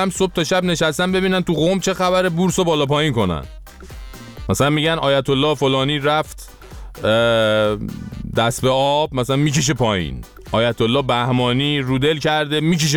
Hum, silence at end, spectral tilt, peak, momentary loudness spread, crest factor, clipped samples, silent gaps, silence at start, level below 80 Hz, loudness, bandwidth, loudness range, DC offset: none; 0 s; -5 dB/octave; -4 dBFS; 13 LU; 14 dB; under 0.1%; none; 0 s; -40 dBFS; -18 LUFS; 19 kHz; 2 LU; under 0.1%